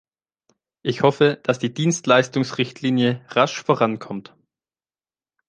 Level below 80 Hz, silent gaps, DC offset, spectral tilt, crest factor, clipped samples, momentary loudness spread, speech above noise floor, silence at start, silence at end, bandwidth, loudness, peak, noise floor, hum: -66 dBFS; none; under 0.1%; -5 dB/octave; 20 dB; under 0.1%; 11 LU; over 70 dB; 0.85 s; 1.3 s; 10 kHz; -20 LUFS; -2 dBFS; under -90 dBFS; none